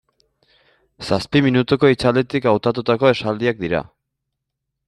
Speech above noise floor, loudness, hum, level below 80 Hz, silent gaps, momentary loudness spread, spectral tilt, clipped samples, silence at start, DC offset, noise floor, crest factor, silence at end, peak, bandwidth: 62 dB; -18 LUFS; none; -50 dBFS; none; 8 LU; -7 dB/octave; under 0.1%; 1 s; under 0.1%; -79 dBFS; 18 dB; 1.05 s; -2 dBFS; 12 kHz